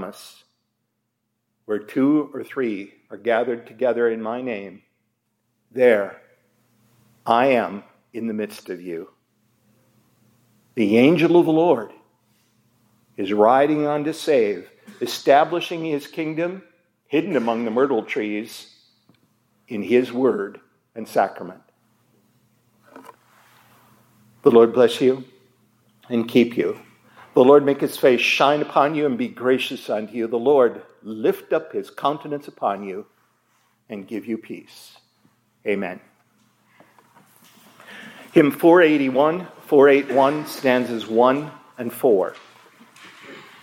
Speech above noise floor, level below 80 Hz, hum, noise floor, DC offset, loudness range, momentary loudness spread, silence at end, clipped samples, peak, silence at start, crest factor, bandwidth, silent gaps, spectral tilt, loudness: 56 dB; -76 dBFS; none; -75 dBFS; under 0.1%; 13 LU; 20 LU; 0.2 s; under 0.1%; 0 dBFS; 0 s; 20 dB; 16.5 kHz; none; -6 dB/octave; -20 LUFS